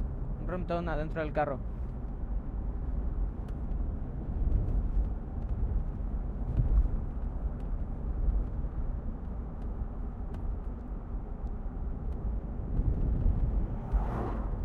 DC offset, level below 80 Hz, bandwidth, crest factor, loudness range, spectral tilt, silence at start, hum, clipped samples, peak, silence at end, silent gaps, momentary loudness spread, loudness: under 0.1%; -32 dBFS; 4.2 kHz; 18 dB; 5 LU; -10 dB/octave; 0 s; none; under 0.1%; -14 dBFS; 0 s; none; 8 LU; -36 LUFS